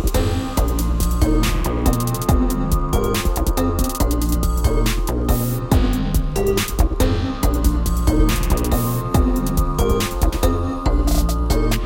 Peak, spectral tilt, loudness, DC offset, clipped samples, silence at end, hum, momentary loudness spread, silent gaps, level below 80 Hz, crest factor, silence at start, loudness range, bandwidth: -2 dBFS; -5.5 dB/octave; -20 LUFS; under 0.1%; under 0.1%; 0 s; none; 2 LU; none; -20 dBFS; 16 dB; 0 s; 1 LU; 17 kHz